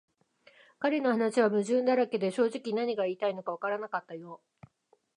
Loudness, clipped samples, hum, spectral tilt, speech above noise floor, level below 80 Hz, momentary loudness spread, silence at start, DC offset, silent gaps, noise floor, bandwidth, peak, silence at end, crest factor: -30 LUFS; under 0.1%; none; -5.5 dB/octave; 41 dB; -84 dBFS; 10 LU; 0.8 s; under 0.1%; none; -70 dBFS; 11 kHz; -12 dBFS; 0.8 s; 18 dB